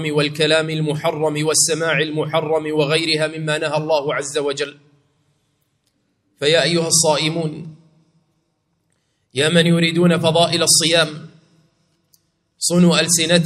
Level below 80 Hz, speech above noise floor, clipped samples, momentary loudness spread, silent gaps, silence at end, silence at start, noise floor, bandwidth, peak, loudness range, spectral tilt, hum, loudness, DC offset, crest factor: -62 dBFS; 51 dB; under 0.1%; 9 LU; none; 0 s; 0 s; -68 dBFS; 14.5 kHz; 0 dBFS; 5 LU; -3.5 dB/octave; none; -17 LUFS; under 0.1%; 18 dB